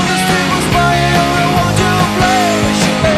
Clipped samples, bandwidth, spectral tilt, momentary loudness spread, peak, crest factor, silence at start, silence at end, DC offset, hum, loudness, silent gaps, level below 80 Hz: under 0.1%; 14 kHz; -4.5 dB/octave; 1 LU; 0 dBFS; 12 dB; 0 s; 0 s; under 0.1%; none; -12 LUFS; none; -28 dBFS